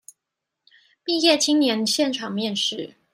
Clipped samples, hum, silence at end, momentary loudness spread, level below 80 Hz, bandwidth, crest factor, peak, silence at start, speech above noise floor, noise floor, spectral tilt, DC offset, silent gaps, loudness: under 0.1%; none; 0.25 s; 9 LU; -76 dBFS; 15.5 kHz; 20 dB; -4 dBFS; 1.05 s; 62 dB; -83 dBFS; -2.5 dB/octave; under 0.1%; none; -21 LUFS